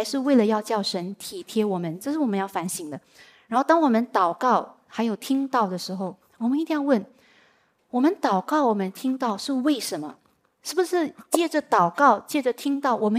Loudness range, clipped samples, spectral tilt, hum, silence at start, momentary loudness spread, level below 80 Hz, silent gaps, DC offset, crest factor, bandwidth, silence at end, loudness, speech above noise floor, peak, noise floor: 3 LU; under 0.1%; -5 dB/octave; none; 0 s; 11 LU; -80 dBFS; none; under 0.1%; 20 dB; 16 kHz; 0 s; -24 LUFS; 39 dB; -4 dBFS; -63 dBFS